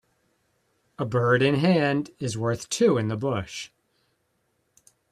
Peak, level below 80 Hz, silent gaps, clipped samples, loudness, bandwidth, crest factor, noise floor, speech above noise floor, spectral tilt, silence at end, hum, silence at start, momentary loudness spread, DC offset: -8 dBFS; -62 dBFS; none; under 0.1%; -24 LUFS; 13 kHz; 18 dB; -72 dBFS; 49 dB; -5.5 dB/octave; 1.45 s; none; 1 s; 13 LU; under 0.1%